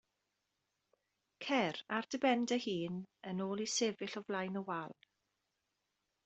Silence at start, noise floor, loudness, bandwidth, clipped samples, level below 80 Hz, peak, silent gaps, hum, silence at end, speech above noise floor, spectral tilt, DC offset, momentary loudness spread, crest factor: 1.4 s; -86 dBFS; -38 LUFS; 8.2 kHz; under 0.1%; -82 dBFS; -20 dBFS; none; none; 1.35 s; 48 dB; -4 dB/octave; under 0.1%; 10 LU; 20 dB